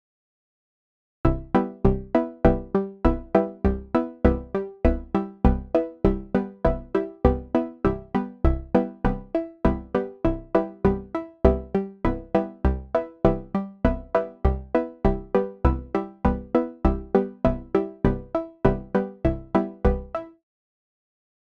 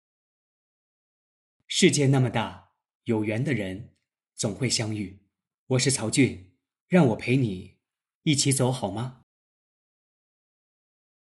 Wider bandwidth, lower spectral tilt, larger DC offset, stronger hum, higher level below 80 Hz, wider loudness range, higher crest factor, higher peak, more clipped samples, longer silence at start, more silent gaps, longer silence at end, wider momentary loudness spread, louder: second, 6 kHz vs 12 kHz; first, -10 dB/octave vs -4.5 dB/octave; neither; neither; first, -30 dBFS vs -64 dBFS; about the same, 2 LU vs 4 LU; about the same, 24 dB vs 22 dB; first, 0 dBFS vs -6 dBFS; neither; second, 1.25 s vs 1.7 s; second, none vs 2.95-3.01 s, 5.54-5.67 s, 6.80-6.86 s, 8.15-8.21 s; second, 1.3 s vs 2.1 s; second, 6 LU vs 14 LU; about the same, -25 LUFS vs -25 LUFS